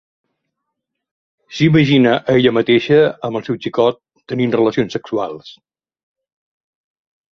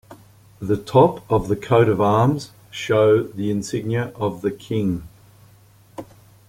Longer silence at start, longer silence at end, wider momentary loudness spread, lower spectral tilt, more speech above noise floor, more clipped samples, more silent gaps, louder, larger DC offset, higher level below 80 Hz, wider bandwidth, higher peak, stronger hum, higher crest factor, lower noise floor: first, 1.5 s vs 0.1 s; first, 1.85 s vs 0.45 s; second, 14 LU vs 18 LU; about the same, -7 dB/octave vs -7 dB/octave; first, 63 dB vs 32 dB; neither; neither; first, -15 LUFS vs -20 LUFS; neither; second, -54 dBFS vs -48 dBFS; second, 7.2 kHz vs 16.5 kHz; about the same, -2 dBFS vs -2 dBFS; neither; about the same, 16 dB vs 18 dB; first, -77 dBFS vs -51 dBFS